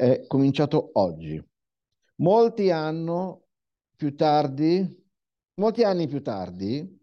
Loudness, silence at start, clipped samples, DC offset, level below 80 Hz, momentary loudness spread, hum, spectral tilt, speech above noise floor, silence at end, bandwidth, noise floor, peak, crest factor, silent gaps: -24 LUFS; 0 s; under 0.1%; under 0.1%; -64 dBFS; 12 LU; none; -8.5 dB/octave; 62 dB; 0.15 s; 7 kHz; -85 dBFS; -8 dBFS; 16 dB; none